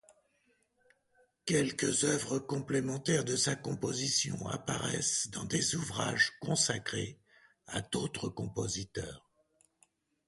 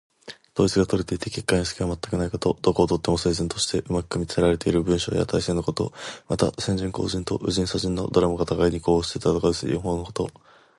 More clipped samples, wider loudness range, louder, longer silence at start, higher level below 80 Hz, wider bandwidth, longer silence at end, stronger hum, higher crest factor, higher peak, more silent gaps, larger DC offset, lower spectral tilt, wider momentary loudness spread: neither; about the same, 4 LU vs 2 LU; second, -33 LUFS vs -24 LUFS; first, 1.45 s vs 0.25 s; second, -62 dBFS vs -42 dBFS; about the same, 11.5 kHz vs 11.5 kHz; first, 1.1 s vs 0.5 s; neither; about the same, 20 dB vs 20 dB; second, -14 dBFS vs -4 dBFS; neither; neither; second, -3 dB/octave vs -5.5 dB/octave; about the same, 9 LU vs 7 LU